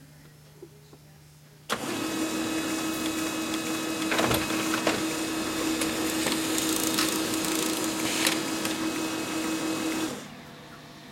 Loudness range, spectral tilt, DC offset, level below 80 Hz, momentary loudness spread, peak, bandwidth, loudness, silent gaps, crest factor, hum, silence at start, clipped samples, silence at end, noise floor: 5 LU; -2.5 dB/octave; under 0.1%; -58 dBFS; 8 LU; -8 dBFS; 17 kHz; -28 LUFS; none; 22 dB; none; 0 s; under 0.1%; 0 s; -52 dBFS